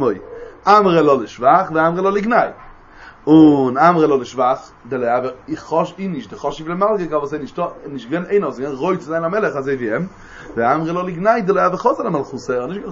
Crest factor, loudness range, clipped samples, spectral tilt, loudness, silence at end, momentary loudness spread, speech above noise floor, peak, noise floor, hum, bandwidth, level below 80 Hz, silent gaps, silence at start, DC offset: 16 dB; 7 LU; under 0.1%; -7 dB/octave; -17 LUFS; 0 s; 13 LU; 25 dB; 0 dBFS; -41 dBFS; none; 7.4 kHz; -50 dBFS; none; 0 s; under 0.1%